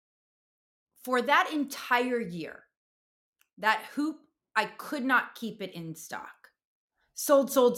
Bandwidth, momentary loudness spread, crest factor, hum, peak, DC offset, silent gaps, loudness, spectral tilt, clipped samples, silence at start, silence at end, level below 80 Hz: 17 kHz; 17 LU; 20 dB; none; -10 dBFS; under 0.1%; 2.77-3.33 s, 3.53-3.57 s, 6.65-6.88 s; -28 LUFS; -3.5 dB/octave; under 0.1%; 1.05 s; 0 s; -78 dBFS